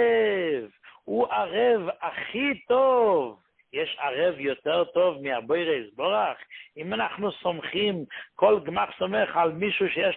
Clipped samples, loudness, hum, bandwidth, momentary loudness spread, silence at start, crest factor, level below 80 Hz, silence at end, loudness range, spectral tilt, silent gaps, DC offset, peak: under 0.1%; -26 LUFS; none; 4.2 kHz; 10 LU; 0 s; 20 dB; -66 dBFS; 0 s; 2 LU; -9 dB/octave; none; under 0.1%; -6 dBFS